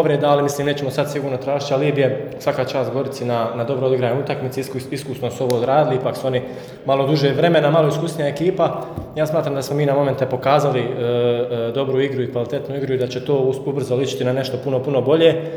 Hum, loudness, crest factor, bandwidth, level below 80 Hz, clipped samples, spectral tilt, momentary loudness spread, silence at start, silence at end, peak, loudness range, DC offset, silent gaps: none; -19 LUFS; 18 dB; over 20 kHz; -56 dBFS; under 0.1%; -6.5 dB/octave; 8 LU; 0 s; 0 s; 0 dBFS; 3 LU; under 0.1%; none